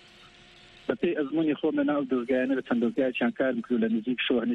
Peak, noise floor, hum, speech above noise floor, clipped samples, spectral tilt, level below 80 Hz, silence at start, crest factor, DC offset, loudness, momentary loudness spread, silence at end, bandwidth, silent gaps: -12 dBFS; -53 dBFS; none; 27 dB; under 0.1%; -7 dB/octave; -66 dBFS; 0.9 s; 16 dB; under 0.1%; -27 LUFS; 2 LU; 0 s; 6.2 kHz; none